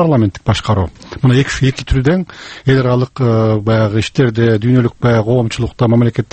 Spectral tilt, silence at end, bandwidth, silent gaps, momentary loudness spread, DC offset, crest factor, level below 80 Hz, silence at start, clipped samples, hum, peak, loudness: -7 dB/octave; 0.1 s; 8.6 kHz; none; 5 LU; under 0.1%; 12 dB; -32 dBFS; 0 s; under 0.1%; none; 0 dBFS; -14 LUFS